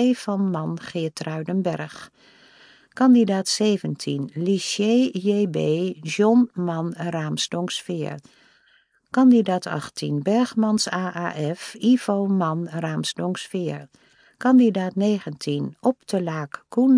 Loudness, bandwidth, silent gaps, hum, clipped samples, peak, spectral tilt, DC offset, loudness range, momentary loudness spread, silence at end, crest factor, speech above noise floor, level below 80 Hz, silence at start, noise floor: -22 LUFS; 10.5 kHz; none; none; under 0.1%; -6 dBFS; -5.5 dB/octave; under 0.1%; 3 LU; 12 LU; 0 s; 16 dB; 40 dB; -72 dBFS; 0 s; -61 dBFS